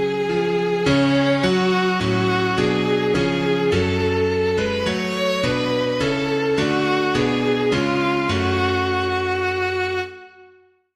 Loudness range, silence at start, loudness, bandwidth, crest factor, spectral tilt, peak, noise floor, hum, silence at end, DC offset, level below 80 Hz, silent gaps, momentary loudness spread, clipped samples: 2 LU; 0 s; -20 LUFS; 14 kHz; 14 dB; -6 dB/octave; -6 dBFS; -53 dBFS; none; 0.5 s; under 0.1%; -46 dBFS; none; 3 LU; under 0.1%